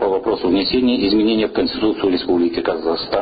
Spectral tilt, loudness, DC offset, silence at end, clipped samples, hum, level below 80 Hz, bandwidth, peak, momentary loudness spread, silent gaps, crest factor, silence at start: -3.5 dB/octave; -17 LUFS; under 0.1%; 0 s; under 0.1%; none; -44 dBFS; 5 kHz; -6 dBFS; 4 LU; none; 12 dB; 0 s